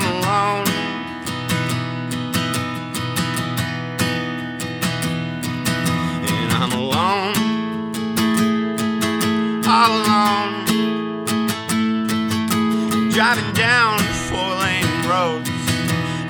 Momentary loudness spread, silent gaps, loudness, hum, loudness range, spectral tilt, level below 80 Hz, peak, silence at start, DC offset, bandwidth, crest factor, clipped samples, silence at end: 8 LU; none; -19 LUFS; none; 5 LU; -4.5 dB/octave; -48 dBFS; -2 dBFS; 0 s; under 0.1%; over 20 kHz; 18 dB; under 0.1%; 0 s